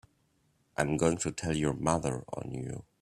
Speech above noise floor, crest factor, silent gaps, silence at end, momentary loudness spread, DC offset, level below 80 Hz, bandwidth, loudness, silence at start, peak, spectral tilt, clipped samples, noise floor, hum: 40 dB; 22 dB; none; 0.2 s; 11 LU; under 0.1%; -54 dBFS; 13.5 kHz; -32 LUFS; 0.8 s; -10 dBFS; -5.5 dB/octave; under 0.1%; -72 dBFS; none